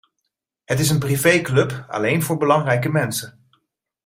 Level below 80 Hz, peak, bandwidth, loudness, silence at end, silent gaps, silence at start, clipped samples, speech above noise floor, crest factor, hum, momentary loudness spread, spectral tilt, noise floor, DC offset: -54 dBFS; -2 dBFS; 16 kHz; -19 LUFS; 0.75 s; none; 0.7 s; under 0.1%; 59 dB; 18 dB; none; 8 LU; -5 dB/octave; -78 dBFS; under 0.1%